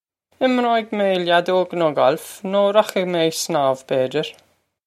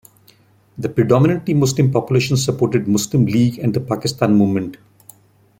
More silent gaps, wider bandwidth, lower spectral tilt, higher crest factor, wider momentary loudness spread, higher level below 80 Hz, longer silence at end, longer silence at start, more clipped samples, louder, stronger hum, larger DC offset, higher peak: neither; about the same, 15.5 kHz vs 16.5 kHz; second, -4.5 dB/octave vs -6.5 dB/octave; about the same, 18 dB vs 16 dB; about the same, 6 LU vs 7 LU; second, -72 dBFS vs -50 dBFS; second, 0.55 s vs 0.85 s; second, 0.4 s vs 0.75 s; neither; about the same, -19 LUFS vs -17 LUFS; neither; neither; about the same, -2 dBFS vs -2 dBFS